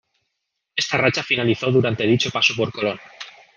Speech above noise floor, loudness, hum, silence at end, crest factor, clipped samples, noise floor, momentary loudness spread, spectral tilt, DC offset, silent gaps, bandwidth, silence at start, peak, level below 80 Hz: 58 dB; -20 LUFS; none; 0.25 s; 20 dB; under 0.1%; -78 dBFS; 12 LU; -4.5 dB/octave; under 0.1%; none; 9.8 kHz; 0.75 s; -2 dBFS; -60 dBFS